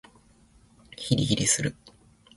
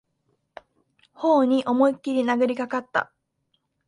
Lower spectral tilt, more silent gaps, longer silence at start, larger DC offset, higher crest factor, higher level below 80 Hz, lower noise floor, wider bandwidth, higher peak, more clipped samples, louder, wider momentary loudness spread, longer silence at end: second, -3.5 dB/octave vs -5.5 dB/octave; neither; second, 1 s vs 1.2 s; neither; about the same, 22 dB vs 18 dB; first, -52 dBFS vs -74 dBFS; second, -58 dBFS vs -73 dBFS; about the same, 11.5 kHz vs 10.5 kHz; about the same, -8 dBFS vs -8 dBFS; neither; about the same, -25 LUFS vs -23 LUFS; first, 16 LU vs 8 LU; second, 0.5 s vs 0.85 s